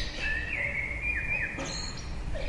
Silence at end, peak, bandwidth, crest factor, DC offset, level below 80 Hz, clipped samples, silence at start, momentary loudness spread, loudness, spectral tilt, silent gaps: 0 s; -18 dBFS; 11.5 kHz; 14 dB; under 0.1%; -38 dBFS; under 0.1%; 0 s; 9 LU; -31 LUFS; -3.5 dB/octave; none